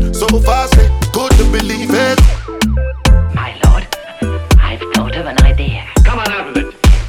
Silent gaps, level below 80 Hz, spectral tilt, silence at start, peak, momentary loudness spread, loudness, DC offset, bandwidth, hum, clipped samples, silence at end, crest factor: none; -12 dBFS; -5.5 dB/octave; 0 s; 0 dBFS; 7 LU; -13 LUFS; under 0.1%; 16 kHz; none; under 0.1%; 0 s; 10 dB